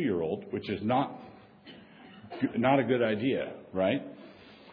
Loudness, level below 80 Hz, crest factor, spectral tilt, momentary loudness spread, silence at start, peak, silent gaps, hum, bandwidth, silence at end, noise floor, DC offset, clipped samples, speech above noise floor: -30 LUFS; -68 dBFS; 20 dB; -9.5 dB/octave; 25 LU; 0 s; -12 dBFS; none; none; 5.2 kHz; 0 s; -52 dBFS; under 0.1%; under 0.1%; 23 dB